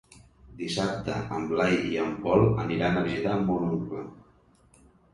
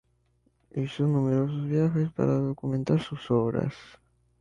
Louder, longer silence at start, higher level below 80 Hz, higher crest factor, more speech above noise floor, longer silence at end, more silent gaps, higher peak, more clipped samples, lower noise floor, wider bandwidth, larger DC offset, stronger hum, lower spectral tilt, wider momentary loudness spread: about the same, -27 LUFS vs -27 LUFS; second, 0.45 s vs 0.75 s; first, -50 dBFS vs -58 dBFS; about the same, 20 dB vs 16 dB; second, 34 dB vs 42 dB; first, 0.95 s vs 0.5 s; neither; first, -8 dBFS vs -12 dBFS; neither; second, -60 dBFS vs -69 dBFS; first, 11.5 kHz vs 7.4 kHz; neither; neither; second, -6.5 dB/octave vs -9 dB/octave; about the same, 11 LU vs 9 LU